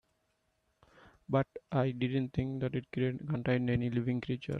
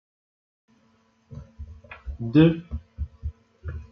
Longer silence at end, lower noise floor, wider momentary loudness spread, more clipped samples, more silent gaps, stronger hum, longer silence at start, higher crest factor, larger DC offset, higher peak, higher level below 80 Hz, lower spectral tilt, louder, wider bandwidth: about the same, 0 s vs 0.1 s; first, -78 dBFS vs -63 dBFS; second, 4 LU vs 26 LU; neither; neither; neither; about the same, 1.3 s vs 1.3 s; second, 18 dB vs 24 dB; neither; second, -18 dBFS vs -4 dBFS; second, -60 dBFS vs -42 dBFS; about the same, -9 dB/octave vs -10 dB/octave; second, -34 LUFS vs -23 LUFS; about the same, 6 kHz vs 5.6 kHz